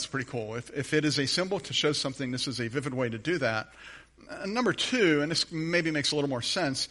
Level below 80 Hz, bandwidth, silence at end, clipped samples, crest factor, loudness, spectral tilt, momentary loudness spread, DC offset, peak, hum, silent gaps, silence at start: -62 dBFS; 11.5 kHz; 0.05 s; under 0.1%; 18 dB; -28 LUFS; -4 dB/octave; 10 LU; under 0.1%; -12 dBFS; none; none; 0 s